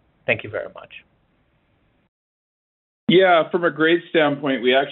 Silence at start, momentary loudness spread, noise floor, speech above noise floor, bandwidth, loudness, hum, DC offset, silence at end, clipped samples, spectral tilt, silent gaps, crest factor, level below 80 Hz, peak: 0.3 s; 16 LU; -63 dBFS; 45 dB; 4.2 kHz; -19 LUFS; none; under 0.1%; 0 s; under 0.1%; -3 dB/octave; 2.08-3.07 s; 18 dB; -66 dBFS; -4 dBFS